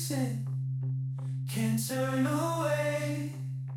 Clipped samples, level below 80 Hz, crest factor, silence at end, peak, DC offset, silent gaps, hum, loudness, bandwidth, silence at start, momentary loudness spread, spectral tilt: under 0.1%; -72 dBFS; 12 dB; 0 s; -18 dBFS; under 0.1%; none; none; -32 LUFS; 17.5 kHz; 0 s; 6 LU; -6 dB/octave